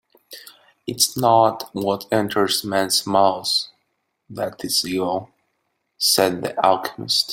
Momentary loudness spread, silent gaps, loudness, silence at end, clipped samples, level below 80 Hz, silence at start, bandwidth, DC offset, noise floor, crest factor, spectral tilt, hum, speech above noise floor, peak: 16 LU; none; -20 LUFS; 0 s; under 0.1%; -62 dBFS; 0.3 s; 17 kHz; under 0.1%; -73 dBFS; 20 dB; -3 dB/octave; none; 53 dB; 0 dBFS